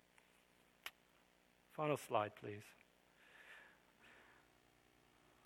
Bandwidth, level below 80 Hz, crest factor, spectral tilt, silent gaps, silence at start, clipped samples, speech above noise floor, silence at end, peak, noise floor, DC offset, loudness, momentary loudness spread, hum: 19 kHz; -86 dBFS; 28 dB; -5 dB/octave; none; 0.85 s; under 0.1%; 31 dB; 1.25 s; -24 dBFS; -74 dBFS; under 0.1%; -45 LUFS; 25 LU; 60 Hz at -80 dBFS